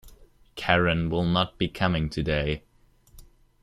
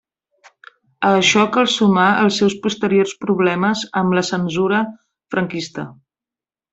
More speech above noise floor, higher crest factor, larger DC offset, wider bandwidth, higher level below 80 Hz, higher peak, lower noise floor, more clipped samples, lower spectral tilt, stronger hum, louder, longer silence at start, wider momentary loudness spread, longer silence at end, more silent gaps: second, 33 dB vs over 73 dB; first, 24 dB vs 16 dB; neither; first, 14.5 kHz vs 8.2 kHz; first, -42 dBFS vs -60 dBFS; about the same, -4 dBFS vs -2 dBFS; second, -58 dBFS vs under -90 dBFS; neither; first, -6.5 dB/octave vs -4.5 dB/octave; neither; second, -26 LUFS vs -17 LUFS; second, 0.05 s vs 1 s; about the same, 11 LU vs 11 LU; second, 0.4 s vs 0.8 s; neither